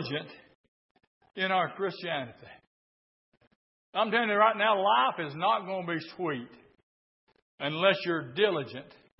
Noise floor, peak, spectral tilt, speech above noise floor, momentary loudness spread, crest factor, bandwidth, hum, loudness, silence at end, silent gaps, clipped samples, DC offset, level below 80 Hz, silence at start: under -90 dBFS; -10 dBFS; -8.5 dB/octave; over 61 dB; 15 LU; 22 dB; 5.8 kHz; none; -29 LUFS; 0.35 s; 0.55-0.95 s, 1.07-1.21 s, 2.67-3.32 s, 3.47-3.93 s, 6.83-7.27 s, 7.42-7.58 s; under 0.1%; under 0.1%; -80 dBFS; 0 s